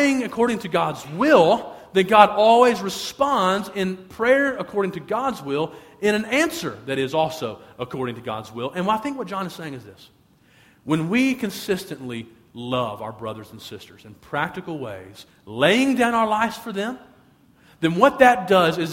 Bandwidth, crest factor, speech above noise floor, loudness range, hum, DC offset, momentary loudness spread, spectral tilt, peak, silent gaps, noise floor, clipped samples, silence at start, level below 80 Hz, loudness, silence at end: 16.5 kHz; 22 dB; 34 dB; 11 LU; none; under 0.1%; 19 LU; -5 dB/octave; 0 dBFS; none; -56 dBFS; under 0.1%; 0 s; -58 dBFS; -21 LUFS; 0 s